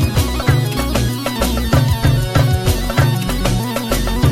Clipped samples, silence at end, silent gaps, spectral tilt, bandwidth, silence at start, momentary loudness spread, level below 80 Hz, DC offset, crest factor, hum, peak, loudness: under 0.1%; 0 s; none; -5.5 dB/octave; 16 kHz; 0 s; 4 LU; -24 dBFS; under 0.1%; 14 dB; none; 0 dBFS; -16 LUFS